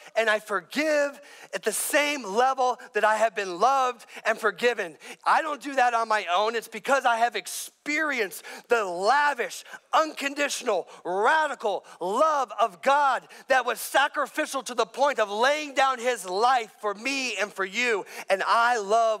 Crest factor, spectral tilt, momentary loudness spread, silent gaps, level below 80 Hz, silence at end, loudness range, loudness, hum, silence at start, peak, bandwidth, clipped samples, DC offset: 14 dB; -1.5 dB/octave; 8 LU; none; -80 dBFS; 0 s; 1 LU; -25 LUFS; none; 0.05 s; -10 dBFS; 16 kHz; under 0.1%; under 0.1%